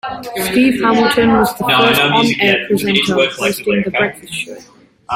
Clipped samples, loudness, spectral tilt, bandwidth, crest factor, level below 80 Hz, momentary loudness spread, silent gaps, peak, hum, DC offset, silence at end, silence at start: under 0.1%; -13 LUFS; -4 dB/octave; 16.5 kHz; 14 dB; -46 dBFS; 12 LU; none; 0 dBFS; none; under 0.1%; 0 s; 0.05 s